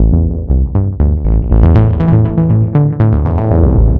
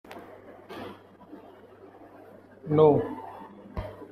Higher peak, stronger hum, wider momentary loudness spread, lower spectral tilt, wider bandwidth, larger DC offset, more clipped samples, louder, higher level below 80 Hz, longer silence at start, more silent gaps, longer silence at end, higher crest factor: first, 0 dBFS vs -6 dBFS; neither; second, 5 LU vs 29 LU; first, -12.5 dB/octave vs -9.5 dB/octave; second, 3.4 kHz vs 5.4 kHz; neither; neither; first, -11 LUFS vs -25 LUFS; first, -14 dBFS vs -52 dBFS; about the same, 0 s vs 0.1 s; neither; about the same, 0 s vs 0.1 s; second, 10 dB vs 24 dB